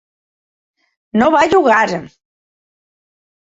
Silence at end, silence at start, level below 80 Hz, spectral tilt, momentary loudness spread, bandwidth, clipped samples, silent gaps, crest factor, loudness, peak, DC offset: 1.45 s; 1.15 s; -52 dBFS; -5 dB/octave; 10 LU; 8 kHz; under 0.1%; none; 16 dB; -13 LUFS; -2 dBFS; under 0.1%